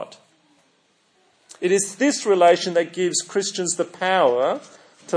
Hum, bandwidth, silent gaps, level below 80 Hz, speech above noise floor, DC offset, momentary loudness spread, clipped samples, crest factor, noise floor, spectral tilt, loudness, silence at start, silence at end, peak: none; 10.5 kHz; none; -82 dBFS; 43 dB; under 0.1%; 8 LU; under 0.1%; 18 dB; -63 dBFS; -3 dB/octave; -20 LUFS; 0 s; 0 s; -4 dBFS